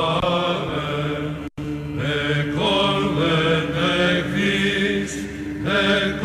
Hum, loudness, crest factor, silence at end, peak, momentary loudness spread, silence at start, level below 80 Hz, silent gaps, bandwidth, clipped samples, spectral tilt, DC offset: none; -21 LUFS; 12 dB; 0 s; -8 dBFS; 10 LU; 0 s; -42 dBFS; none; 13.5 kHz; under 0.1%; -5.5 dB/octave; under 0.1%